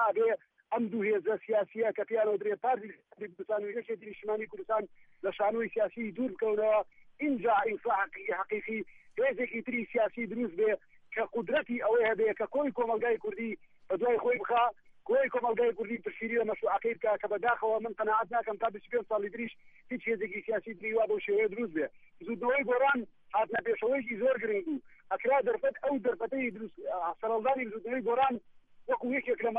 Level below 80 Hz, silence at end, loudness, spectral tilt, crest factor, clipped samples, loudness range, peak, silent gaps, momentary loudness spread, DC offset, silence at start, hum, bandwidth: -72 dBFS; 0 s; -32 LUFS; -8 dB/octave; 14 dB; under 0.1%; 3 LU; -16 dBFS; none; 10 LU; under 0.1%; 0 s; none; 3.8 kHz